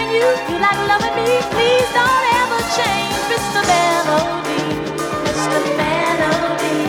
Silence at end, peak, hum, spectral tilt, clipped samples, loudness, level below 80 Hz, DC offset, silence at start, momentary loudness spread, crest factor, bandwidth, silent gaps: 0 s; -2 dBFS; none; -3.5 dB/octave; under 0.1%; -16 LUFS; -44 dBFS; under 0.1%; 0 s; 6 LU; 14 dB; 19 kHz; none